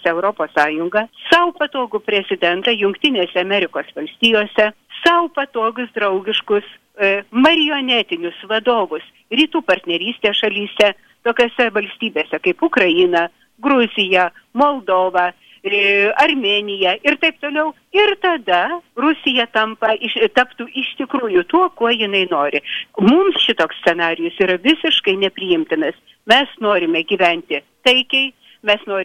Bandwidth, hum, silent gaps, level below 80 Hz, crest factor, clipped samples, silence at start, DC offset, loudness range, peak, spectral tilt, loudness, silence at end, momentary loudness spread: 13 kHz; none; none; -58 dBFS; 16 dB; under 0.1%; 0.05 s; under 0.1%; 2 LU; -2 dBFS; -4.5 dB/octave; -16 LUFS; 0 s; 8 LU